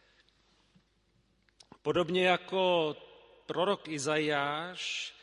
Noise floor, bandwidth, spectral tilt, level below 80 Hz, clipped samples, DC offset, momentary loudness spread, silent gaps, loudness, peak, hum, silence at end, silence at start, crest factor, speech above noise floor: -71 dBFS; 11.5 kHz; -4 dB/octave; -72 dBFS; under 0.1%; under 0.1%; 11 LU; none; -31 LUFS; -12 dBFS; none; 0.1 s; 1.85 s; 22 dB; 40 dB